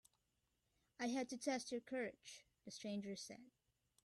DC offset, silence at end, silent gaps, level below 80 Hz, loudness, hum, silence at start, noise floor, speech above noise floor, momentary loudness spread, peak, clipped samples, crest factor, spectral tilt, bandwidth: under 0.1%; 0.55 s; none; -86 dBFS; -47 LUFS; none; 1 s; -86 dBFS; 39 dB; 15 LU; -30 dBFS; under 0.1%; 20 dB; -3.5 dB/octave; 13 kHz